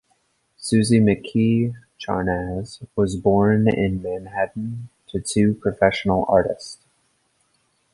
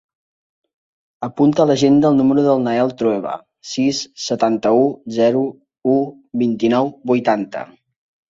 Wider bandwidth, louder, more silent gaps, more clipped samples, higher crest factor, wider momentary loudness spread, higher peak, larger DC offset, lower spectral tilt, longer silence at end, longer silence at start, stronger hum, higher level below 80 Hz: first, 11.5 kHz vs 7.8 kHz; second, -21 LUFS vs -17 LUFS; neither; neither; about the same, 18 dB vs 16 dB; about the same, 14 LU vs 14 LU; about the same, -2 dBFS vs -2 dBFS; neither; about the same, -6.5 dB/octave vs -6 dB/octave; first, 1.2 s vs 0.65 s; second, 0.6 s vs 1.2 s; neither; first, -44 dBFS vs -60 dBFS